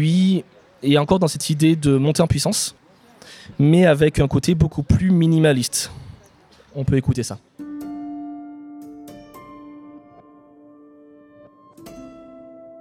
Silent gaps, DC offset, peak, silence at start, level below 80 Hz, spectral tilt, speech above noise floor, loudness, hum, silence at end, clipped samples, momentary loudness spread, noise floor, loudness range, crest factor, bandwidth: none; under 0.1%; -2 dBFS; 0 s; -42 dBFS; -6 dB/octave; 34 dB; -18 LUFS; none; 0 s; under 0.1%; 25 LU; -51 dBFS; 19 LU; 18 dB; 16 kHz